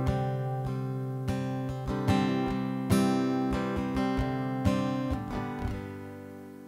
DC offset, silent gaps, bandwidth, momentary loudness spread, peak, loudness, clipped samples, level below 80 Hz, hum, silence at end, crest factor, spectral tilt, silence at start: under 0.1%; none; 16 kHz; 9 LU; -12 dBFS; -30 LUFS; under 0.1%; -44 dBFS; none; 0 s; 18 dB; -7 dB/octave; 0 s